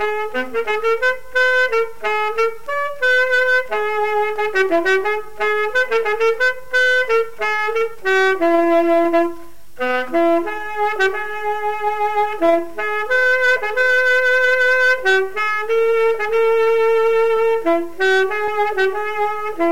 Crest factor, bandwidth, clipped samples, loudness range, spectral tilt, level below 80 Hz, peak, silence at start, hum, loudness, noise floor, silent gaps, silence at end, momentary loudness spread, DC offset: 12 dB; 16.5 kHz; under 0.1%; 4 LU; -3 dB/octave; -54 dBFS; -6 dBFS; 0 s; none; -17 LUFS; -38 dBFS; none; 0 s; 7 LU; 3%